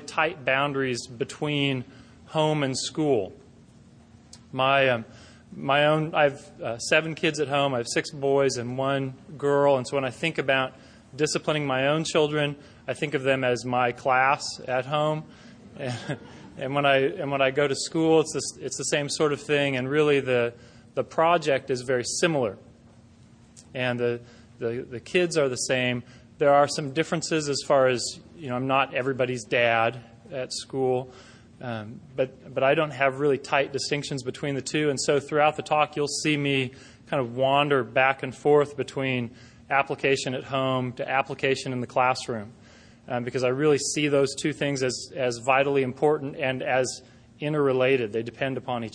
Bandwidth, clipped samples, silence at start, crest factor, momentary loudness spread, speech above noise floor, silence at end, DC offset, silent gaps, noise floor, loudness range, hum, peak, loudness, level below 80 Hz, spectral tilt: 10.5 kHz; under 0.1%; 0 s; 20 dB; 12 LU; 28 dB; 0.05 s; under 0.1%; none; -53 dBFS; 3 LU; none; -6 dBFS; -25 LUFS; -62 dBFS; -4.5 dB/octave